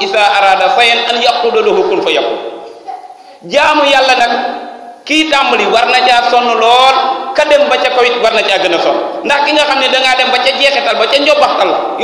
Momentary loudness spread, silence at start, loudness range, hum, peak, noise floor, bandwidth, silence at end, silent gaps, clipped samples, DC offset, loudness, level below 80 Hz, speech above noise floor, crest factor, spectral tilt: 9 LU; 0 s; 3 LU; none; 0 dBFS; -30 dBFS; 11 kHz; 0 s; none; 1%; under 0.1%; -9 LUFS; -50 dBFS; 20 dB; 10 dB; -2 dB/octave